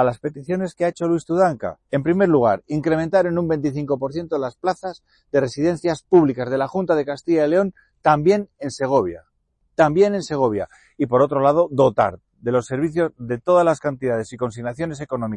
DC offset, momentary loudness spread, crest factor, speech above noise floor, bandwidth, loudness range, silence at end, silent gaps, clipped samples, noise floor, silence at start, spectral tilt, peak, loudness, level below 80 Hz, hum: under 0.1%; 11 LU; 16 dB; 47 dB; 10.5 kHz; 2 LU; 0 s; none; under 0.1%; -67 dBFS; 0 s; -7 dB/octave; -4 dBFS; -20 LUFS; -54 dBFS; none